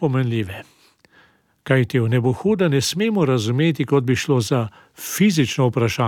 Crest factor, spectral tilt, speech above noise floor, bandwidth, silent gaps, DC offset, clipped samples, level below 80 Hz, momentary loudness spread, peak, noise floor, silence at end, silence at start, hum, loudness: 16 dB; -6 dB/octave; 37 dB; 17.5 kHz; none; under 0.1%; under 0.1%; -56 dBFS; 10 LU; -4 dBFS; -56 dBFS; 0 s; 0 s; none; -19 LUFS